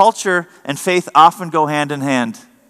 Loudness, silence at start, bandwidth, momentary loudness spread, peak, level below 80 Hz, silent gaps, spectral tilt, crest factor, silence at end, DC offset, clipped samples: -15 LUFS; 0 s; 15 kHz; 10 LU; 0 dBFS; -70 dBFS; none; -4 dB/octave; 16 dB; 0.3 s; under 0.1%; 0.5%